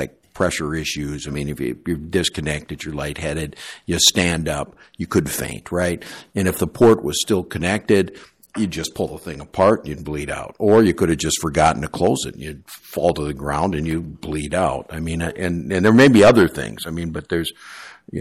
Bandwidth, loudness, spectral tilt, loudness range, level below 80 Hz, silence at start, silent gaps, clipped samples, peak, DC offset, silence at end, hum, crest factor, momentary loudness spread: 15.5 kHz; -19 LUFS; -4.5 dB/octave; 6 LU; -40 dBFS; 0 s; none; under 0.1%; 0 dBFS; under 0.1%; 0 s; none; 20 dB; 14 LU